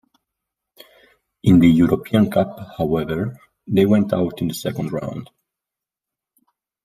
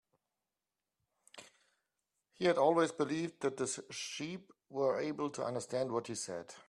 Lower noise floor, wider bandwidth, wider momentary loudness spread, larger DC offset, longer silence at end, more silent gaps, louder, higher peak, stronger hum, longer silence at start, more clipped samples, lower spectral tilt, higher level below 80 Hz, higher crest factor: about the same, -87 dBFS vs under -90 dBFS; first, 15 kHz vs 12.5 kHz; about the same, 13 LU vs 15 LU; neither; first, 1.6 s vs 0.05 s; neither; first, -19 LUFS vs -36 LUFS; first, -2 dBFS vs -16 dBFS; neither; about the same, 1.45 s vs 1.35 s; neither; first, -7.5 dB/octave vs -4 dB/octave; first, -50 dBFS vs -80 dBFS; about the same, 18 dB vs 22 dB